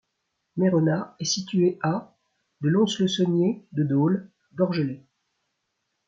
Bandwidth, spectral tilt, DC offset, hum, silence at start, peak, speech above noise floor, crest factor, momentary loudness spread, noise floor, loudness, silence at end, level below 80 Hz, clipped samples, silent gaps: 7.8 kHz; -6 dB/octave; under 0.1%; none; 0.55 s; -10 dBFS; 55 dB; 16 dB; 9 LU; -78 dBFS; -24 LUFS; 1.1 s; -70 dBFS; under 0.1%; none